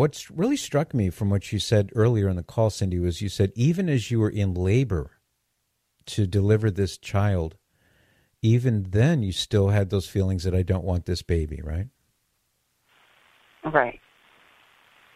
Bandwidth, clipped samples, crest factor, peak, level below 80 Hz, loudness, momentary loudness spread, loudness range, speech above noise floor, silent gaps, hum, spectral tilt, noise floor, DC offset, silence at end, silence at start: 14.5 kHz; under 0.1%; 20 dB; -4 dBFS; -44 dBFS; -24 LUFS; 8 LU; 6 LU; 51 dB; none; none; -6.5 dB/octave; -75 dBFS; under 0.1%; 1.2 s; 0 s